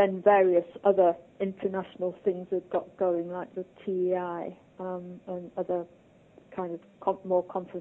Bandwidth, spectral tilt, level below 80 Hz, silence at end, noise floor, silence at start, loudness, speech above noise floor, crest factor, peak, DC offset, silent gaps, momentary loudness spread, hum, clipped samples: 3.9 kHz; -9.5 dB/octave; -72 dBFS; 0 s; -57 dBFS; 0 s; -29 LUFS; 28 dB; 20 dB; -8 dBFS; under 0.1%; none; 16 LU; none; under 0.1%